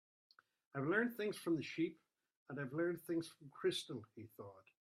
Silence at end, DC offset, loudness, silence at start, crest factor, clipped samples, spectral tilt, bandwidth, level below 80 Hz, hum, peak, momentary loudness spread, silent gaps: 0.3 s; under 0.1%; -42 LUFS; 0.75 s; 20 dB; under 0.1%; -5.5 dB/octave; 15.5 kHz; -86 dBFS; none; -24 dBFS; 18 LU; 2.37-2.46 s